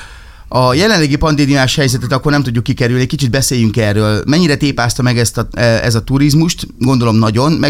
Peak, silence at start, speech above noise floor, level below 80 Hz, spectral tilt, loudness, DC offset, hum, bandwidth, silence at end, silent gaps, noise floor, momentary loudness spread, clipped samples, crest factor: 0 dBFS; 0 s; 22 dB; -30 dBFS; -5 dB/octave; -12 LUFS; under 0.1%; none; 16 kHz; 0 s; none; -33 dBFS; 4 LU; under 0.1%; 12 dB